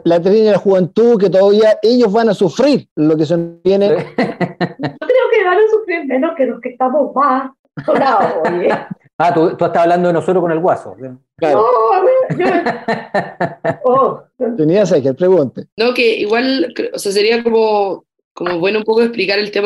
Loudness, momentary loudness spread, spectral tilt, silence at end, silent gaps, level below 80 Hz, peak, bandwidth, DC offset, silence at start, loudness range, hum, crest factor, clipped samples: -14 LUFS; 9 LU; -6 dB/octave; 0 s; 2.91-2.96 s, 7.59-7.64 s, 9.13-9.19 s, 15.72-15.77 s, 18.24-18.35 s; -60 dBFS; -4 dBFS; 12 kHz; under 0.1%; 0.05 s; 3 LU; none; 10 dB; under 0.1%